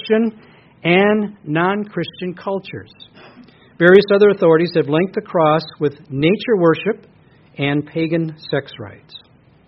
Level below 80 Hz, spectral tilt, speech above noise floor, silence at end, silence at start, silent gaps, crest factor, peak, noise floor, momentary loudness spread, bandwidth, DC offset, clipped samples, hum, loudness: -58 dBFS; -5 dB/octave; 29 dB; 0.5 s; 0.05 s; none; 18 dB; 0 dBFS; -45 dBFS; 14 LU; 5.8 kHz; under 0.1%; under 0.1%; none; -17 LUFS